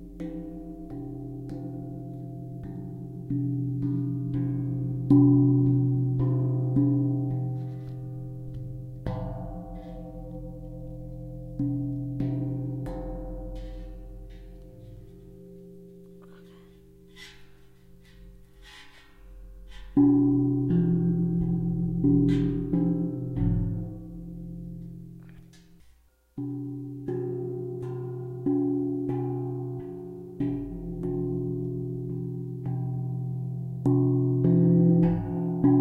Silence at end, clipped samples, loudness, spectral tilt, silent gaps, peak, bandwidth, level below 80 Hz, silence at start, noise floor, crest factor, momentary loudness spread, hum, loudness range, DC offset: 0 s; under 0.1%; -28 LUFS; -11 dB/octave; none; -8 dBFS; 4.3 kHz; -46 dBFS; 0 s; -59 dBFS; 20 dB; 22 LU; none; 14 LU; under 0.1%